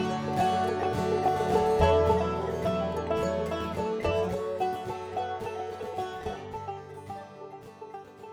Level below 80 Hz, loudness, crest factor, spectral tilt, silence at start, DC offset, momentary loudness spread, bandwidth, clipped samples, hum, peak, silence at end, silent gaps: -46 dBFS; -29 LUFS; 20 dB; -6.5 dB/octave; 0 s; under 0.1%; 18 LU; 18.5 kHz; under 0.1%; none; -10 dBFS; 0 s; none